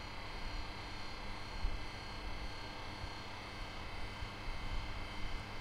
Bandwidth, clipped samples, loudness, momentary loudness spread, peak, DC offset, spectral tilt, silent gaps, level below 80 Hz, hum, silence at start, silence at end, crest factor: 14 kHz; under 0.1%; -46 LUFS; 2 LU; -24 dBFS; under 0.1%; -4.5 dB/octave; none; -46 dBFS; none; 0 s; 0 s; 18 dB